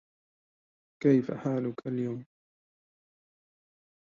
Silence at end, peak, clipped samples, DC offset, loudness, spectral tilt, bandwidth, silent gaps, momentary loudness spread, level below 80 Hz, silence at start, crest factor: 1.9 s; -12 dBFS; under 0.1%; under 0.1%; -30 LUFS; -9.5 dB/octave; 7.2 kHz; none; 10 LU; -76 dBFS; 1 s; 22 dB